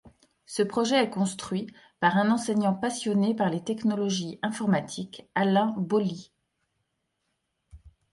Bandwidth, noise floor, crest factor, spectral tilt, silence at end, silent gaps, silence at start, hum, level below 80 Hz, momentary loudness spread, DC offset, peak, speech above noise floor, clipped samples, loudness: 11.5 kHz; -78 dBFS; 20 dB; -5.5 dB/octave; 0.25 s; none; 0.05 s; none; -64 dBFS; 9 LU; under 0.1%; -8 dBFS; 52 dB; under 0.1%; -27 LUFS